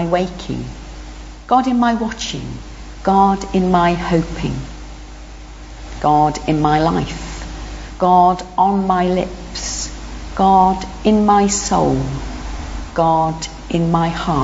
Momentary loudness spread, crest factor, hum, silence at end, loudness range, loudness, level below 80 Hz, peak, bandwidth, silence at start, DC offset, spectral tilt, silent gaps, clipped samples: 21 LU; 16 dB; 50 Hz at -35 dBFS; 0 s; 3 LU; -16 LUFS; -32 dBFS; -2 dBFS; 8 kHz; 0 s; under 0.1%; -5.5 dB/octave; none; under 0.1%